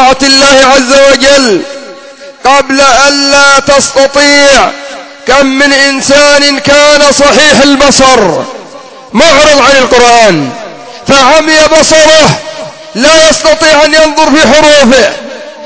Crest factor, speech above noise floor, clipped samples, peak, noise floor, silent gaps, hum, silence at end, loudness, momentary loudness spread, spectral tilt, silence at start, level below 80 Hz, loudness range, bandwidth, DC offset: 4 dB; 24 dB; 10%; 0 dBFS; -28 dBFS; none; none; 0 s; -3 LUFS; 13 LU; -2 dB/octave; 0 s; -32 dBFS; 1 LU; 8 kHz; 3%